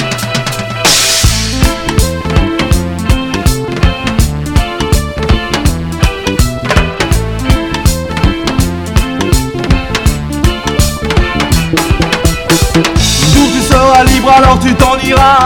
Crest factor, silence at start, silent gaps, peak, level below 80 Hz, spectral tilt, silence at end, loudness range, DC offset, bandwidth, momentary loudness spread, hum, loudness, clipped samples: 10 dB; 0 s; none; 0 dBFS; -16 dBFS; -4.5 dB/octave; 0 s; 5 LU; under 0.1%; 19.5 kHz; 7 LU; none; -10 LUFS; 1%